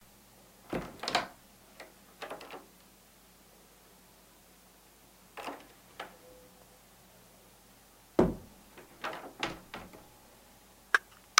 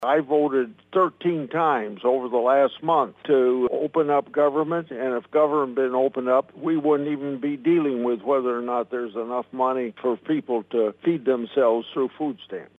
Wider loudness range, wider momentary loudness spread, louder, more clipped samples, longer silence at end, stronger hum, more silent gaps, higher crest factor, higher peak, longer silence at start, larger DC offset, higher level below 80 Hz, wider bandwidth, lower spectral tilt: first, 14 LU vs 3 LU; first, 27 LU vs 7 LU; second, -36 LUFS vs -23 LUFS; neither; first, 0.35 s vs 0.15 s; neither; neither; first, 38 dB vs 16 dB; first, -2 dBFS vs -6 dBFS; first, 0.65 s vs 0 s; neither; first, -58 dBFS vs -74 dBFS; first, 16.5 kHz vs 4 kHz; second, -3 dB/octave vs -8.5 dB/octave